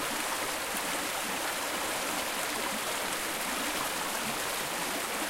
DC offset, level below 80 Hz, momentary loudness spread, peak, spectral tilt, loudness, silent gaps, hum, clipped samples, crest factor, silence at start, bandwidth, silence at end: under 0.1%; -60 dBFS; 1 LU; -14 dBFS; -1 dB/octave; -31 LUFS; none; none; under 0.1%; 18 dB; 0 s; 16 kHz; 0 s